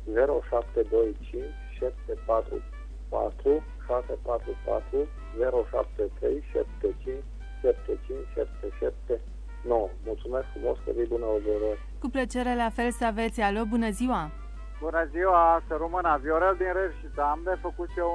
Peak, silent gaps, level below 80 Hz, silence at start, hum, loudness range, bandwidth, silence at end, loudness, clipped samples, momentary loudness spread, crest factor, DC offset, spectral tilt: -8 dBFS; none; -38 dBFS; 0 s; none; 6 LU; 11 kHz; 0 s; -29 LUFS; under 0.1%; 11 LU; 20 dB; under 0.1%; -6.5 dB/octave